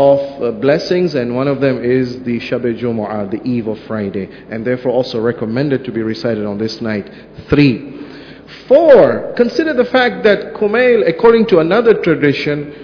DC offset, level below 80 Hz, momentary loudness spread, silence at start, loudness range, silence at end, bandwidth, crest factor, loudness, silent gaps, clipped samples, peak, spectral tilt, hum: under 0.1%; -44 dBFS; 12 LU; 0 s; 7 LU; 0 s; 5.4 kHz; 14 dB; -14 LUFS; none; 0.4%; 0 dBFS; -7.5 dB/octave; none